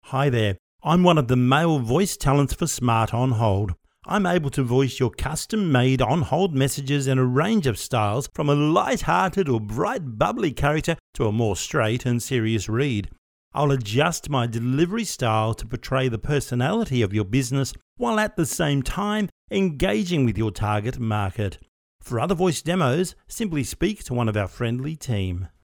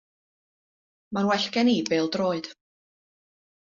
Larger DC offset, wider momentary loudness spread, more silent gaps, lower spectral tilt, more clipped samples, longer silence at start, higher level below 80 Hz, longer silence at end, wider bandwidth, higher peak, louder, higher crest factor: neither; second, 7 LU vs 11 LU; first, 0.59-0.79 s, 11.00-11.13 s, 13.18-13.51 s, 17.82-17.96 s, 19.32-19.48 s, 21.68-21.99 s vs none; first, -5.5 dB/octave vs -3.5 dB/octave; neither; second, 0.05 s vs 1.1 s; first, -42 dBFS vs -70 dBFS; second, 0.15 s vs 1.25 s; first, 19.5 kHz vs 7.4 kHz; first, -4 dBFS vs -10 dBFS; about the same, -23 LUFS vs -25 LUFS; about the same, 20 dB vs 18 dB